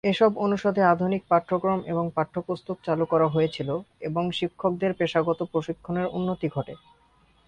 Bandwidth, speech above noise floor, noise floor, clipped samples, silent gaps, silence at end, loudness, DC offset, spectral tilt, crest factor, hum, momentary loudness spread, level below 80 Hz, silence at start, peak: 9.4 kHz; 36 dB; -61 dBFS; under 0.1%; none; 0.7 s; -26 LUFS; under 0.1%; -7.5 dB/octave; 18 dB; none; 9 LU; -60 dBFS; 0.05 s; -6 dBFS